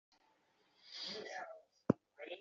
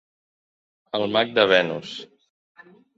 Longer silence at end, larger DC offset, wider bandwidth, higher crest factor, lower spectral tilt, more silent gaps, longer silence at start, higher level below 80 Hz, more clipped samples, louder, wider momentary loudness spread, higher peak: second, 0 s vs 0.9 s; neither; about the same, 7.4 kHz vs 7.8 kHz; first, 32 dB vs 24 dB; about the same, -4.5 dB/octave vs -5 dB/octave; neither; about the same, 0.85 s vs 0.95 s; second, -80 dBFS vs -68 dBFS; neither; second, -43 LUFS vs -21 LUFS; second, 14 LU vs 17 LU; second, -14 dBFS vs -2 dBFS